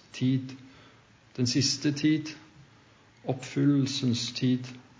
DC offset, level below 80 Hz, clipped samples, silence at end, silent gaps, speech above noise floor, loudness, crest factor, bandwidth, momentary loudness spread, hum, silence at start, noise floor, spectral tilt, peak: under 0.1%; -68 dBFS; under 0.1%; 0.2 s; none; 30 dB; -28 LUFS; 16 dB; 7.8 kHz; 17 LU; none; 0.15 s; -58 dBFS; -5 dB/octave; -14 dBFS